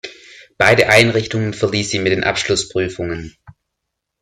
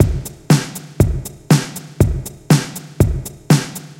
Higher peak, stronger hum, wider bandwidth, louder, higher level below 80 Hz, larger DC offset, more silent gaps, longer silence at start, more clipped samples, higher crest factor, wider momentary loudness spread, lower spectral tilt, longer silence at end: about the same, 0 dBFS vs 0 dBFS; neither; second, 15 kHz vs 17 kHz; about the same, -15 LUFS vs -17 LUFS; second, -46 dBFS vs -28 dBFS; neither; neither; about the same, 0.05 s vs 0 s; neither; about the same, 18 dB vs 16 dB; first, 15 LU vs 11 LU; second, -4 dB/octave vs -6 dB/octave; first, 0.9 s vs 0.05 s